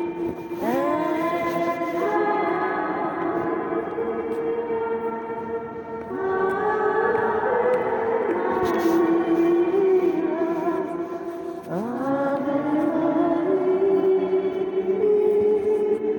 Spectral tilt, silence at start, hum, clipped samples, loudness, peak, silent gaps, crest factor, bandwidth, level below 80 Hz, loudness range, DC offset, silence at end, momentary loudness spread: -7 dB/octave; 0 s; none; under 0.1%; -23 LUFS; -10 dBFS; none; 12 dB; 17.5 kHz; -60 dBFS; 5 LU; under 0.1%; 0 s; 9 LU